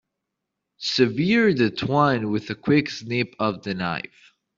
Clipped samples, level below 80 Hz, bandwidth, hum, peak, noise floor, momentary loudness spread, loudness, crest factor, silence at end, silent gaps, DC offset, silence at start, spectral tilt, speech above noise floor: under 0.1%; -58 dBFS; 7.6 kHz; none; -4 dBFS; -82 dBFS; 9 LU; -22 LUFS; 18 dB; 0.55 s; none; under 0.1%; 0.8 s; -6 dB/octave; 60 dB